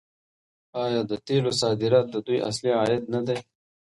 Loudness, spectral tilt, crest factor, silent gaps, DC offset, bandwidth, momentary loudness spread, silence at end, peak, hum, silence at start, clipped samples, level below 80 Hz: -25 LUFS; -5.5 dB/octave; 18 dB; none; under 0.1%; 11.5 kHz; 8 LU; 0.55 s; -8 dBFS; none; 0.75 s; under 0.1%; -64 dBFS